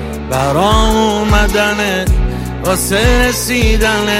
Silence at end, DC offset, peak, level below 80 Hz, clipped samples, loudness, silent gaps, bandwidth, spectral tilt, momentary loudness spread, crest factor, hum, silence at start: 0 s; under 0.1%; 0 dBFS; -18 dBFS; under 0.1%; -13 LUFS; none; 16.5 kHz; -4.5 dB/octave; 5 LU; 12 dB; none; 0 s